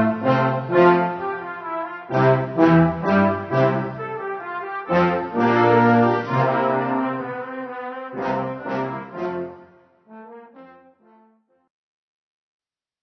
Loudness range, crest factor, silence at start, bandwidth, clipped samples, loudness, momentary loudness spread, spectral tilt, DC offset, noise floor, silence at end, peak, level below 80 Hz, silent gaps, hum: 13 LU; 20 dB; 0 s; 6.2 kHz; under 0.1%; -21 LUFS; 14 LU; -9 dB/octave; under 0.1%; -59 dBFS; 2.35 s; -2 dBFS; -56 dBFS; none; none